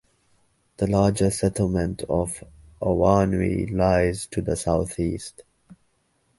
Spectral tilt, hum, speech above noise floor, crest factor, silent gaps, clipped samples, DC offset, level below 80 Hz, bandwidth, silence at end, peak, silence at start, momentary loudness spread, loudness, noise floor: -6.5 dB/octave; none; 45 dB; 20 dB; none; under 0.1%; under 0.1%; -40 dBFS; 11.5 kHz; 0.95 s; -4 dBFS; 0.8 s; 9 LU; -23 LUFS; -68 dBFS